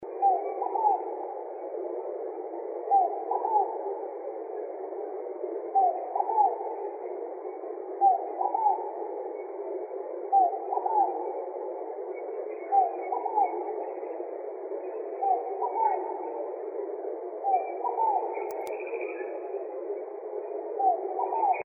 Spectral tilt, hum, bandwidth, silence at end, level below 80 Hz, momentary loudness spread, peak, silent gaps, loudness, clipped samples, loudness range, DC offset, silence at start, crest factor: 4 dB/octave; none; 2.8 kHz; 0 s; under -90 dBFS; 11 LU; -12 dBFS; none; -30 LUFS; under 0.1%; 3 LU; under 0.1%; 0 s; 18 dB